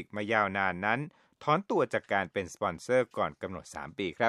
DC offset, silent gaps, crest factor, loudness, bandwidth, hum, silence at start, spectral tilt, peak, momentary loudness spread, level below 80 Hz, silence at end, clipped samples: under 0.1%; none; 20 dB; -31 LUFS; 12.5 kHz; none; 0 s; -5.5 dB/octave; -10 dBFS; 12 LU; -66 dBFS; 0 s; under 0.1%